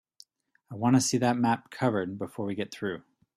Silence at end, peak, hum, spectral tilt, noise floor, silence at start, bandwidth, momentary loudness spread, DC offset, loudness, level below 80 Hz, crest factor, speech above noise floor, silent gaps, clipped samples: 0.35 s; -12 dBFS; none; -5 dB/octave; -59 dBFS; 0.7 s; 14.5 kHz; 12 LU; under 0.1%; -28 LUFS; -68 dBFS; 18 dB; 32 dB; none; under 0.1%